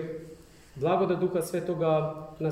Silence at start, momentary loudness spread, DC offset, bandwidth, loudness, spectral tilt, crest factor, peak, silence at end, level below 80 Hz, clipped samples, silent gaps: 0 s; 16 LU; under 0.1%; 16 kHz; -28 LUFS; -7 dB/octave; 14 dB; -14 dBFS; 0 s; -60 dBFS; under 0.1%; none